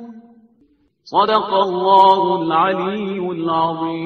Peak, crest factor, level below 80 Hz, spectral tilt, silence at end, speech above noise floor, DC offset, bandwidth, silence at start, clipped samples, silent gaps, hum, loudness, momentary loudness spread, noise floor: 0 dBFS; 16 dB; -60 dBFS; -7 dB/octave; 0 s; 42 dB; under 0.1%; 6.4 kHz; 0 s; under 0.1%; none; none; -16 LUFS; 11 LU; -58 dBFS